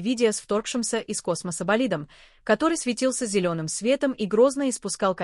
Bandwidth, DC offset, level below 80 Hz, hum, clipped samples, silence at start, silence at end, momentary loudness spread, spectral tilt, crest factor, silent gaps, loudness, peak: 13 kHz; under 0.1%; -60 dBFS; none; under 0.1%; 0 s; 0 s; 7 LU; -4 dB/octave; 16 dB; none; -25 LUFS; -8 dBFS